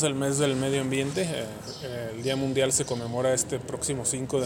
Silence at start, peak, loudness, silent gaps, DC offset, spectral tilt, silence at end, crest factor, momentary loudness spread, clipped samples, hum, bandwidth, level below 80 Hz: 0 s; -8 dBFS; -27 LUFS; none; under 0.1%; -4 dB/octave; 0 s; 20 dB; 10 LU; under 0.1%; none; 17 kHz; -56 dBFS